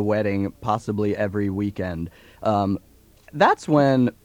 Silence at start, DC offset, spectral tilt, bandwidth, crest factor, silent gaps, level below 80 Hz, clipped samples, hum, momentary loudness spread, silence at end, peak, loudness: 0 s; under 0.1%; -7.5 dB/octave; 16.5 kHz; 18 dB; none; -52 dBFS; under 0.1%; none; 12 LU; 0.15 s; -4 dBFS; -22 LUFS